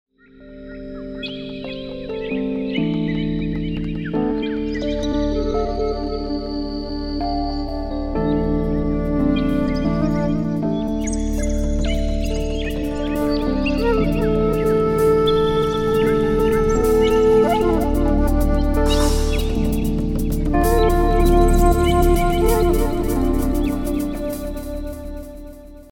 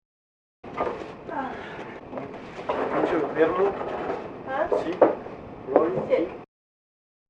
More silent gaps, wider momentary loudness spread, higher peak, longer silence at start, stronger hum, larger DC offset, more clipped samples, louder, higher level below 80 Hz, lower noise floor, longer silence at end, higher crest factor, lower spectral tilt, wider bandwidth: neither; second, 12 LU vs 15 LU; about the same, -2 dBFS vs -2 dBFS; second, 0.4 s vs 0.65 s; neither; neither; neither; first, -20 LUFS vs -26 LUFS; first, -24 dBFS vs -58 dBFS; second, -43 dBFS vs under -90 dBFS; second, 0.1 s vs 0.85 s; second, 16 dB vs 24 dB; about the same, -6.5 dB/octave vs -7 dB/octave; first, 17.5 kHz vs 8.2 kHz